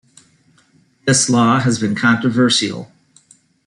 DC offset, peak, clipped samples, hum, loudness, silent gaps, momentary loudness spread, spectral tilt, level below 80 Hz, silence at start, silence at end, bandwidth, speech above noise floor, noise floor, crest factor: under 0.1%; -2 dBFS; under 0.1%; none; -15 LUFS; none; 10 LU; -4 dB/octave; -58 dBFS; 1.05 s; 0.85 s; 11.5 kHz; 40 dB; -55 dBFS; 16 dB